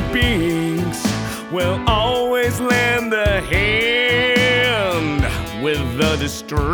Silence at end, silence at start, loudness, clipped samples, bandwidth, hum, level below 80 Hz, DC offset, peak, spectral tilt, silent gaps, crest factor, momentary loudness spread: 0 s; 0 s; -17 LUFS; under 0.1%; over 20 kHz; none; -30 dBFS; under 0.1%; -2 dBFS; -4.5 dB/octave; none; 14 dB; 7 LU